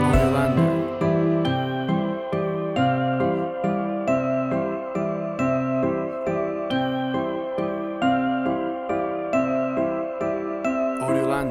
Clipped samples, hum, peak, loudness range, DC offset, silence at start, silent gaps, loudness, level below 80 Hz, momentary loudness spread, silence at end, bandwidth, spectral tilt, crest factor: under 0.1%; none; -6 dBFS; 2 LU; under 0.1%; 0 s; none; -24 LUFS; -40 dBFS; 6 LU; 0 s; 13 kHz; -7.5 dB/octave; 16 dB